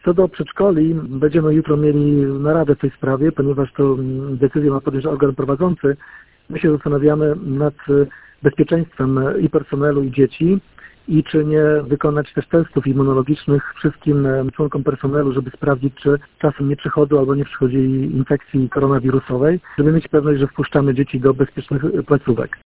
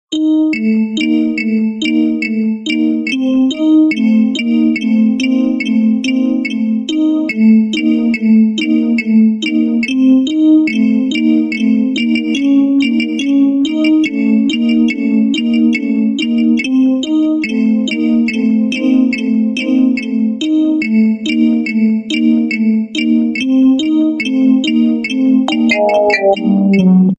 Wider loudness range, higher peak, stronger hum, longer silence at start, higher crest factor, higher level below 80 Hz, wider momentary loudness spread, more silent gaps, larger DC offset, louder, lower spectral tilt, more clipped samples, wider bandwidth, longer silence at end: about the same, 2 LU vs 2 LU; about the same, 0 dBFS vs 0 dBFS; neither; about the same, 0.05 s vs 0.1 s; about the same, 16 dB vs 12 dB; first, -44 dBFS vs -56 dBFS; about the same, 5 LU vs 4 LU; neither; neither; second, -17 LUFS vs -12 LUFS; first, -12.5 dB/octave vs -6 dB/octave; neither; second, 4 kHz vs 8.2 kHz; about the same, 0.1 s vs 0.05 s